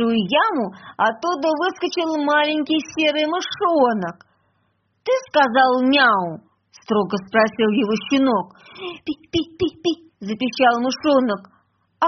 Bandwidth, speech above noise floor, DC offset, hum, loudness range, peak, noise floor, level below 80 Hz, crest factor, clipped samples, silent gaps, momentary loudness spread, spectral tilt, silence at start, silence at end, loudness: 6.4 kHz; 47 dB; under 0.1%; none; 3 LU; -2 dBFS; -67 dBFS; -60 dBFS; 18 dB; under 0.1%; none; 14 LU; -2.5 dB/octave; 0 s; 0 s; -19 LUFS